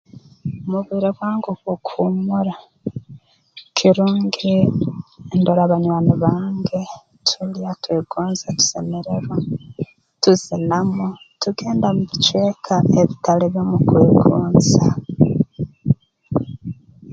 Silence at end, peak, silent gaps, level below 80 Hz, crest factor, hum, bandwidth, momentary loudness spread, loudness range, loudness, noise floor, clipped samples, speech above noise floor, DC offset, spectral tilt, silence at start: 0 s; 0 dBFS; none; -46 dBFS; 18 dB; none; 7.8 kHz; 14 LU; 6 LU; -18 LUFS; -45 dBFS; under 0.1%; 28 dB; under 0.1%; -6 dB/octave; 0.15 s